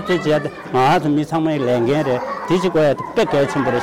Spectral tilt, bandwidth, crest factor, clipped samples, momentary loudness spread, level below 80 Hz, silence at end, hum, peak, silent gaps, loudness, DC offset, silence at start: -6.5 dB/octave; 16 kHz; 8 dB; under 0.1%; 5 LU; -50 dBFS; 0 s; none; -10 dBFS; none; -18 LUFS; under 0.1%; 0 s